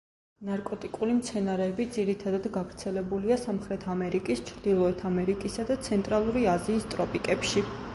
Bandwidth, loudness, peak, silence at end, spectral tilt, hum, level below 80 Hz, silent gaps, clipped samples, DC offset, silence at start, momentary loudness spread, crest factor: 11.5 kHz; -29 LUFS; -12 dBFS; 0 s; -5.5 dB/octave; none; -52 dBFS; none; under 0.1%; under 0.1%; 0.4 s; 8 LU; 18 dB